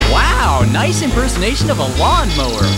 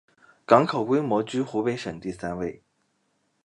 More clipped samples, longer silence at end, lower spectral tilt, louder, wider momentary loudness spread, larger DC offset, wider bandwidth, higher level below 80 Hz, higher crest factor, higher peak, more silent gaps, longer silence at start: neither; second, 0 s vs 0.9 s; second, -4.5 dB/octave vs -6.5 dB/octave; first, -14 LUFS vs -25 LUFS; second, 3 LU vs 13 LU; first, 0.6% vs under 0.1%; first, 16 kHz vs 11 kHz; first, -18 dBFS vs -60 dBFS; second, 12 dB vs 24 dB; about the same, -2 dBFS vs -2 dBFS; neither; second, 0 s vs 0.5 s